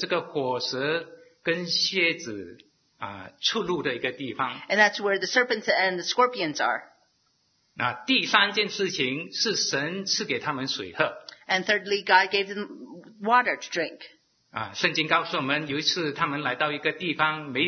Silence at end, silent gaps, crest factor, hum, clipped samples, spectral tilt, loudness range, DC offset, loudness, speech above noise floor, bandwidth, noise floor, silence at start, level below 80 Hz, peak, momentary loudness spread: 0 s; none; 24 dB; none; under 0.1%; -3 dB/octave; 3 LU; under 0.1%; -25 LUFS; 43 dB; 6.6 kHz; -69 dBFS; 0 s; -72 dBFS; -2 dBFS; 13 LU